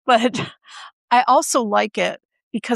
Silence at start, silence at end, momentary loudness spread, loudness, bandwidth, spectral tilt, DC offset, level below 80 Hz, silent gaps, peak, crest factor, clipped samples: 0.05 s; 0 s; 23 LU; -18 LUFS; 13.5 kHz; -3 dB/octave; under 0.1%; -70 dBFS; 0.93-1.08 s, 2.25-2.29 s, 2.43-2.51 s; -2 dBFS; 18 dB; under 0.1%